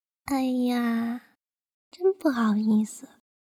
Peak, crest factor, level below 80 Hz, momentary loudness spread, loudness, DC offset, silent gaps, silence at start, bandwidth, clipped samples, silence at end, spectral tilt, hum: -10 dBFS; 16 dB; -66 dBFS; 10 LU; -26 LUFS; under 0.1%; 1.74-1.91 s; 0.25 s; 15.5 kHz; under 0.1%; 0.5 s; -6 dB/octave; none